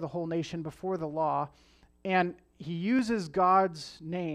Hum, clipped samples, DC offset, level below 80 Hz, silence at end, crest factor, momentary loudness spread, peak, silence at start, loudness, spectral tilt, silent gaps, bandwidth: none; under 0.1%; under 0.1%; -64 dBFS; 0 s; 18 dB; 15 LU; -12 dBFS; 0 s; -30 LUFS; -6.5 dB/octave; none; 12 kHz